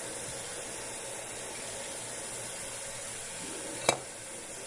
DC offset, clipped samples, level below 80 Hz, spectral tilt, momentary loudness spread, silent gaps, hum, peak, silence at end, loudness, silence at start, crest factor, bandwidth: under 0.1%; under 0.1%; -64 dBFS; -1.5 dB/octave; 8 LU; none; none; -6 dBFS; 0 s; -36 LUFS; 0 s; 32 dB; 11.5 kHz